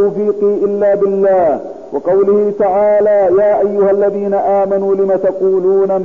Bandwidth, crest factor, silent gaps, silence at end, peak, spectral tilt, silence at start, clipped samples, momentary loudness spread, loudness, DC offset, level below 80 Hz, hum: 3 kHz; 8 dB; none; 0 s; -4 dBFS; -9.5 dB/octave; 0 s; under 0.1%; 4 LU; -12 LUFS; 0.6%; -52 dBFS; none